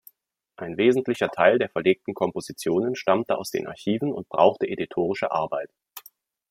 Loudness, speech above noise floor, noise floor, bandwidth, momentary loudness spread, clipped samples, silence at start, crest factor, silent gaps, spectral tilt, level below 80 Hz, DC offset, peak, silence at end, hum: -24 LUFS; 44 dB; -68 dBFS; 16 kHz; 13 LU; under 0.1%; 0.6 s; 22 dB; none; -5.5 dB/octave; -68 dBFS; under 0.1%; -2 dBFS; 0.5 s; none